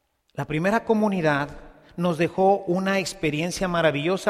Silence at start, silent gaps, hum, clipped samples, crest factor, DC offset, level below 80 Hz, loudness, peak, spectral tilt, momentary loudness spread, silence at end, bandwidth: 0.35 s; none; none; under 0.1%; 16 dB; under 0.1%; -50 dBFS; -23 LUFS; -6 dBFS; -5.5 dB/octave; 10 LU; 0 s; 15 kHz